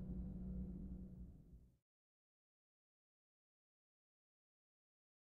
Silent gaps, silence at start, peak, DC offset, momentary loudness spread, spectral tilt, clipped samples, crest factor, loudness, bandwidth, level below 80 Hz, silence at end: none; 0 s; -38 dBFS; under 0.1%; 16 LU; -12.5 dB/octave; under 0.1%; 18 dB; -52 LUFS; 1.9 kHz; -60 dBFS; 3.45 s